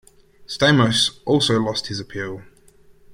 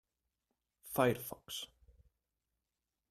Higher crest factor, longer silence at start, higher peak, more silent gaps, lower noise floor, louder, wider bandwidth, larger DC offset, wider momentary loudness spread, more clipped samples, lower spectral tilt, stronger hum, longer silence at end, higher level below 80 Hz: second, 20 dB vs 26 dB; second, 0.4 s vs 0.85 s; first, -2 dBFS vs -16 dBFS; neither; second, -51 dBFS vs -90 dBFS; first, -19 LUFS vs -37 LUFS; about the same, 16 kHz vs 16 kHz; neither; about the same, 16 LU vs 18 LU; neither; about the same, -4.5 dB/octave vs -4.5 dB/octave; neither; second, 0.7 s vs 1.45 s; first, -54 dBFS vs -70 dBFS